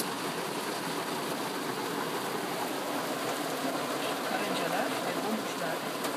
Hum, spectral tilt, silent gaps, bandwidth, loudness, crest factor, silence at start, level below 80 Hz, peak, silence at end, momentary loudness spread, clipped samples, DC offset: none; -3 dB/octave; none; 15.5 kHz; -32 LUFS; 16 dB; 0 s; -80 dBFS; -16 dBFS; 0 s; 3 LU; under 0.1%; under 0.1%